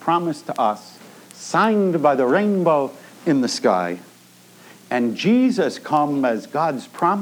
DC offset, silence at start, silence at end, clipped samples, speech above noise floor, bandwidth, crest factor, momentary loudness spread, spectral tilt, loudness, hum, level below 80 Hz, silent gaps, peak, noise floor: under 0.1%; 0 s; 0 s; under 0.1%; 29 dB; 19.5 kHz; 18 dB; 9 LU; -5.5 dB/octave; -20 LUFS; none; -80 dBFS; none; -2 dBFS; -49 dBFS